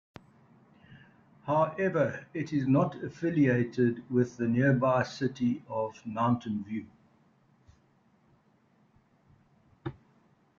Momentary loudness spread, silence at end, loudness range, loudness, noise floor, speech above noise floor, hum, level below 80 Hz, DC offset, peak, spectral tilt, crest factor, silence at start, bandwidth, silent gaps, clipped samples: 13 LU; 0.65 s; 9 LU; -29 LUFS; -66 dBFS; 38 dB; none; -68 dBFS; under 0.1%; -14 dBFS; -8 dB/octave; 18 dB; 0.9 s; 7.4 kHz; none; under 0.1%